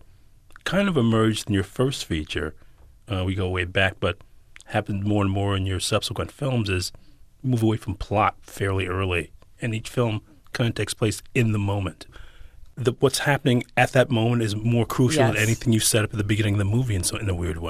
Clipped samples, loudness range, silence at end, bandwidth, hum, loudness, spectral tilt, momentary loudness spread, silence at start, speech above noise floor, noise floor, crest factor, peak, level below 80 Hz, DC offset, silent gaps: under 0.1%; 5 LU; 0 s; 15 kHz; none; -24 LUFS; -5 dB/octave; 9 LU; 0.5 s; 27 dB; -50 dBFS; 18 dB; -6 dBFS; -44 dBFS; under 0.1%; none